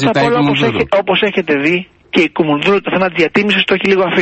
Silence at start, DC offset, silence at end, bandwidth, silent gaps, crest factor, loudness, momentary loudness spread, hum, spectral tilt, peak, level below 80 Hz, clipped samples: 0 s; under 0.1%; 0 s; 8.4 kHz; none; 12 dB; -13 LUFS; 3 LU; none; -6 dB/octave; 0 dBFS; -48 dBFS; under 0.1%